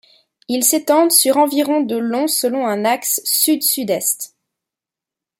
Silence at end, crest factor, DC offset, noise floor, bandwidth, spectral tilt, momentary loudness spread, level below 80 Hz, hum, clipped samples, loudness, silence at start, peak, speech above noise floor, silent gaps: 1.15 s; 18 dB; under 0.1%; -87 dBFS; 16.5 kHz; -2 dB/octave; 8 LU; -72 dBFS; none; under 0.1%; -16 LUFS; 0.5 s; 0 dBFS; 71 dB; none